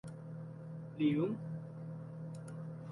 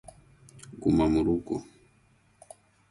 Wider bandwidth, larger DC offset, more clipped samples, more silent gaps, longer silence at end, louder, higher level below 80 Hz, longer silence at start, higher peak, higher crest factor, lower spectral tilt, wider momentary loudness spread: about the same, 11.5 kHz vs 11.5 kHz; neither; neither; neither; second, 0 s vs 1.3 s; second, -41 LUFS vs -27 LUFS; second, -74 dBFS vs -48 dBFS; second, 0.05 s vs 0.7 s; second, -22 dBFS vs -12 dBFS; about the same, 18 dB vs 18 dB; about the same, -8.5 dB/octave vs -7.5 dB/octave; second, 14 LU vs 22 LU